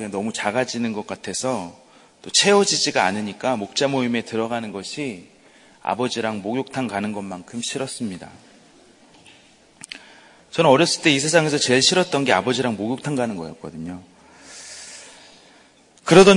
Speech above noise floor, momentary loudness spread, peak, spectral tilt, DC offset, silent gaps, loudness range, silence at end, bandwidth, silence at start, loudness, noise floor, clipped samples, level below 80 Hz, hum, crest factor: 33 dB; 21 LU; 0 dBFS; -3.5 dB/octave; under 0.1%; none; 12 LU; 0 s; 11 kHz; 0 s; -21 LUFS; -53 dBFS; under 0.1%; -60 dBFS; none; 22 dB